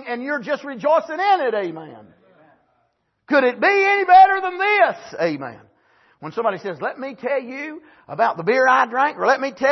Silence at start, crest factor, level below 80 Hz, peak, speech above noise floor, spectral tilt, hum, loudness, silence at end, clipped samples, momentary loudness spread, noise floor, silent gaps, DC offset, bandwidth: 0 s; 18 dB; -68 dBFS; -2 dBFS; 49 dB; -5 dB/octave; none; -18 LUFS; 0 s; under 0.1%; 16 LU; -68 dBFS; none; under 0.1%; 6.2 kHz